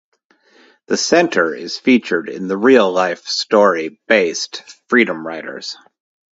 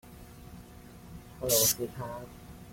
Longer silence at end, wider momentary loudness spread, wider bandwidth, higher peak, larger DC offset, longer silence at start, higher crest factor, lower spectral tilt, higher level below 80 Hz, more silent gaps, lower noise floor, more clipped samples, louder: first, 0.55 s vs 0 s; second, 14 LU vs 26 LU; second, 8 kHz vs 16.5 kHz; first, 0 dBFS vs -12 dBFS; neither; first, 0.9 s vs 0.05 s; second, 16 dB vs 22 dB; about the same, -3.5 dB/octave vs -2.5 dB/octave; second, -66 dBFS vs -54 dBFS; neither; about the same, -53 dBFS vs -50 dBFS; neither; first, -16 LUFS vs -28 LUFS